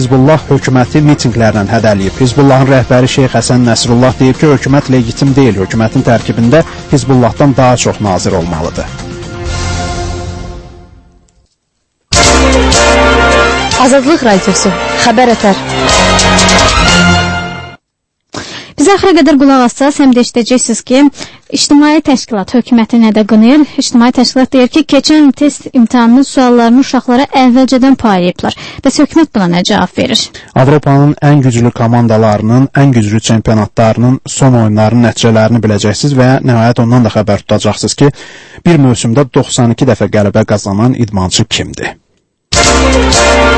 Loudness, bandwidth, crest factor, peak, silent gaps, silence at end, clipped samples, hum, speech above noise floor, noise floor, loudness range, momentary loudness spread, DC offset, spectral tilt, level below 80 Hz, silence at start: -8 LUFS; 11 kHz; 8 dB; 0 dBFS; none; 0 s; 1%; none; 60 dB; -68 dBFS; 3 LU; 8 LU; under 0.1%; -5 dB/octave; -24 dBFS; 0 s